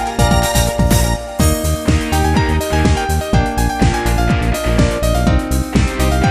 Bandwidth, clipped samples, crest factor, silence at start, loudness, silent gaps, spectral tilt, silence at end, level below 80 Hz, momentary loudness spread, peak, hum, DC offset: 15.5 kHz; under 0.1%; 14 dB; 0 s; -15 LUFS; none; -5 dB/octave; 0 s; -18 dBFS; 3 LU; 0 dBFS; none; under 0.1%